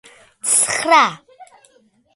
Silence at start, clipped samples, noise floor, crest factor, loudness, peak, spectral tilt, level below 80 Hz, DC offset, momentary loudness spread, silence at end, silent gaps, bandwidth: 0.45 s; under 0.1%; -56 dBFS; 20 dB; -15 LUFS; 0 dBFS; -0.5 dB/octave; -64 dBFS; under 0.1%; 7 LU; 0.7 s; none; 12 kHz